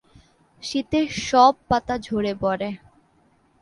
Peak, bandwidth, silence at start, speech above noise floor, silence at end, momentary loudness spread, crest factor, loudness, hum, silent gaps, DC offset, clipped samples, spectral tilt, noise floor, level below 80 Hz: -4 dBFS; 11.5 kHz; 0.65 s; 40 dB; 0.85 s; 14 LU; 20 dB; -22 LUFS; none; none; under 0.1%; under 0.1%; -4.5 dB/octave; -61 dBFS; -50 dBFS